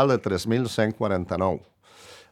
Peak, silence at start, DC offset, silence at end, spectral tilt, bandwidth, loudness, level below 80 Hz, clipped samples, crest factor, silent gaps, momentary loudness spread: -6 dBFS; 0 s; under 0.1%; 0.15 s; -6.5 dB/octave; 16 kHz; -25 LUFS; -60 dBFS; under 0.1%; 20 dB; none; 4 LU